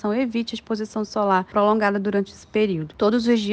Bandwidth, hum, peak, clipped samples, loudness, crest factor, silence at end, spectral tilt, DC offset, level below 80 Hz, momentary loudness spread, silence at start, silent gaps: 8.8 kHz; none; -6 dBFS; under 0.1%; -22 LUFS; 14 dB; 0 s; -6 dB/octave; under 0.1%; -56 dBFS; 8 LU; 0.05 s; none